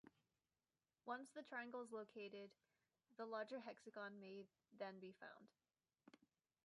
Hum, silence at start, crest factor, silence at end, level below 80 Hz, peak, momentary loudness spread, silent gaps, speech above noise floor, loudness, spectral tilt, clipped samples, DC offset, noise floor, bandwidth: none; 0.05 s; 20 dB; 0.5 s; under -90 dBFS; -36 dBFS; 11 LU; none; over 35 dB; -55 LUFS; -5 dB/octave; under 0.1%; under 0.1%; under -90 dBFS; 10.5 kHz